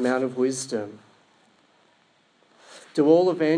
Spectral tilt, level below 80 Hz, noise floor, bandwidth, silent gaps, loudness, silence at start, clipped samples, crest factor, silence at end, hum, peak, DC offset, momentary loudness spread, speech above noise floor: -5.5 dB/octave; -84 dBFS; -62 dBFS; 10.5 kHz; none; -23 LUFS; 0 s; under 0.1%; 20 dB; 0 s; none; -6 dBFS; under 0.1%; 13 LU; 41 dB